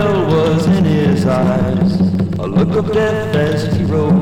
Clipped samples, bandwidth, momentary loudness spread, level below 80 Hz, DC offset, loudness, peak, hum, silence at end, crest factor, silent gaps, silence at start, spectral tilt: under 0.1%; 11 kHz; 3 LU; -38 dBFS; under 0.1%; -14 LUFS; -2 dBFS; none; 0 s; 12 dB; none; 0 s; -8 dB/octave